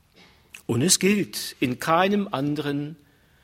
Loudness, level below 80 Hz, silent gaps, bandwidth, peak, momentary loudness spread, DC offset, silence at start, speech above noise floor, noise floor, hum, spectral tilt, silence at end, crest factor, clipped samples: -23 LUFS; -60 dBFS; none; 16 kHz; -4 dBFS; 12 LU; under 0.1%; 0.55 s; 32 dB; -55 dBFS; none; -4 dB/octave; 0.5 s; 22 dB; under 0.1%